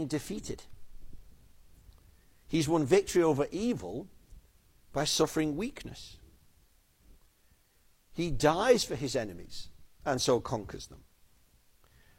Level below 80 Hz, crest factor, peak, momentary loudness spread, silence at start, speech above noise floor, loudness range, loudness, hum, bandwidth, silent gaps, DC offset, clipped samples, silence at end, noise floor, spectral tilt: -52 dBFS; 24 dB; -10 dBFS; 20 LU; 0 s; 36 dB; 5 LU; -30 LUFS; none; 16.5 kHz; none; under 0.1%; under 0.1%; 1.2 s; -66 dBFS; -4.5 dB/octave